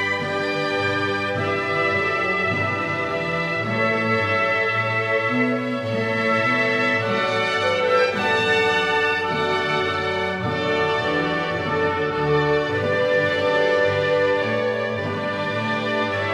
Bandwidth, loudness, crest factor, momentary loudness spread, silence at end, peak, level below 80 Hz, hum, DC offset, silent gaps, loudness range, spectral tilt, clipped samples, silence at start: 12.5 kHz; -21 LUFS; 14 dB; 4 LU; 0 s; -8 dBFS; -56 dBFS; none; under 0.1%; none; 2 LU; -5.5 dB/octave; under 0.1%; 0 s